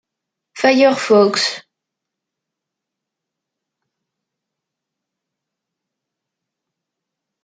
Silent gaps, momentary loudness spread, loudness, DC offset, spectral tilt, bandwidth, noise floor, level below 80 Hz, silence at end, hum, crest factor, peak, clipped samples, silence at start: none; 8 LU; -14 LUFS; under 0.1%; -3.5 dB/octave; 9.4 kHz; -82 dBFS; -72 dBFS; 5.85 s; none; 20 dB; -2 dBFS; under 0.1%; 0.55 s